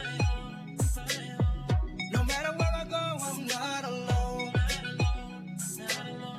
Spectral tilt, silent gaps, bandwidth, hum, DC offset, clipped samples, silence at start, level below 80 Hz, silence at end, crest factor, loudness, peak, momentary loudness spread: -4.5 dB/octave; none; 15.5 kHz; none; under 0.1%; under 0.1%; 0 s; -36 dBFS; 0 s; 12 dB; -31 LUFS; -20 dBFS; 6 LU